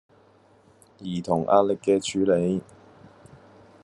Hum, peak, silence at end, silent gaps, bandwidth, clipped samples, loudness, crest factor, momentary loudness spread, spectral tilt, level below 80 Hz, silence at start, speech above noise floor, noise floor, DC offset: none; -4 dBFS; 1.2 s; none; 11.5 kHz; under 0.1%; -24 LUFS; 22 dB; 12 LU; -6 dB/octave; -66 dBFS; 1 s; 34 dB; -57 dBFS; under 0.1%